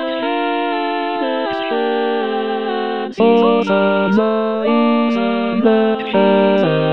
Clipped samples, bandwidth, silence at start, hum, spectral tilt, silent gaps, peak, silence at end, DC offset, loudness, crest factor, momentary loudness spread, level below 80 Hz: under 0.1%; 6.4 kHz; 0 s; none; -8 dB/octave; none; -2 dBFS; 0 s; 0.6%; -16 LUFS; 14 dB; 7 LU; -62 dBFS